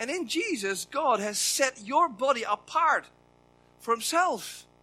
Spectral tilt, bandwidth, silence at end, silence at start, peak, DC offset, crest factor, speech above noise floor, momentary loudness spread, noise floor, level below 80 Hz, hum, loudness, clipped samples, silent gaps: -1.5 dB/octave; 16 kHz; 0.2 s; 0 s; -8 dBFS; under 0.1%; 20 dB; 33 dB; 6 LU; -61 dBFS; -72 dBFS; 60 Hz at -65 dBFS; -27 LUFS; under 0.1%; none